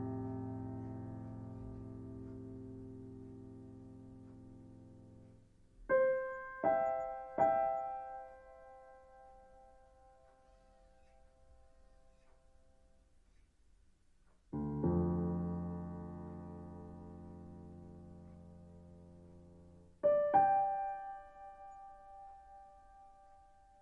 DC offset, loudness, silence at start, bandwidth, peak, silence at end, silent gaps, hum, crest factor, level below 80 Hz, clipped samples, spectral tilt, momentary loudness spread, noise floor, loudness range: under 0.1%; -38 LUFS; 0 s; 7.2 kHz; -18 dBFS; 0.4 s; none; none; 24 dB; -64 dBFS; under 0.1%; -10 dB/octave; 26 LU; -68 dBFS; 17 LU